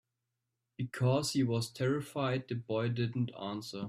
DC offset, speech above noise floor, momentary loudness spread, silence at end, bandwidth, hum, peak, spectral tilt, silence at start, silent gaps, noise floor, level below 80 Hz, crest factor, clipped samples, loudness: under 0.1%; 53 dB; 9 LU; 0 s; 15 kHz; none; -18 dBFS; -6 dB/octave; 0.8 s; none; -86 dBFS; -70 dBFS; 18 dB; under 0.1%; -34 LUFS